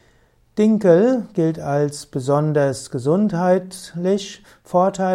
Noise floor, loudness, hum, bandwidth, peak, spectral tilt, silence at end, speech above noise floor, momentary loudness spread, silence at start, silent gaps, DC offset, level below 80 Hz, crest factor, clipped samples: -57 dBFS; -19 LUFS; none; 13.5 kHz; -2 dBFS; -7 dB/octave; 0 s; 38 dB; 10 LU; 0.55 s; none; under 0.1%; -58 dBFS; 16 dB; under 0.1%